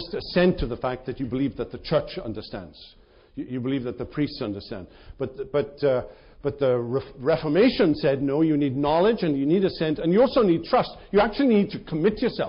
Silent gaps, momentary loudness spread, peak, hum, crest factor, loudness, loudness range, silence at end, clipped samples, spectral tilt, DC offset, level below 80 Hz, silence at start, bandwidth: none; 14 LU; -10 dBFS; none; 14 dB; -24 LUFS; 9 LU; 0 s; under 0.1%; -5.5 dB/octave; under 0.1%; -46 dBFS; 0 s; 5.4 kHz